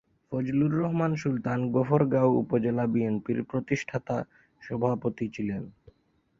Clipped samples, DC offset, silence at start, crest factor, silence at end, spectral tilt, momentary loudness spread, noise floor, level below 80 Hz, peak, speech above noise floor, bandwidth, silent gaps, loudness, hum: under 0.1%; under 0.1%; 0.3 s; 20 dB; 0.7 s; -8.5 dB/octave; 10 LU; -67 dBFS; -60 dBFS; -8 dBFS; 40 dB; 7.6 kHz; none; -28 LUFS; none